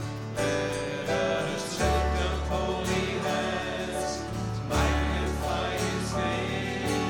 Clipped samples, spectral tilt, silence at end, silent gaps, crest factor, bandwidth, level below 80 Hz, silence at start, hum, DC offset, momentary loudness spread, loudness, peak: under 0.1%; -5 dB/octave; 0 s; none; 16 dB; 17.5 kHz; -38 dBFS; 0 s; none; under 0.1%; 5 LU; -29 LUFS; -12 dBFS